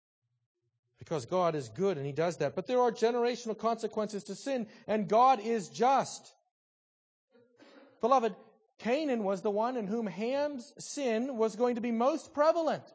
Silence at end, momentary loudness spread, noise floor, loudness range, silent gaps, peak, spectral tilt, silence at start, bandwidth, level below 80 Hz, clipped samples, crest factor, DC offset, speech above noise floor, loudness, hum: 0.1 s; 9 LU; -60 dBFS; 3 LU; 6.51-7.28 s; -14 dBFS; -5.5 dB/octave; 1 s; 8 kHz; -78 dBFS; under 0.1%; 18 dB; under 0.1%; 29 dB; -31 LUFS; none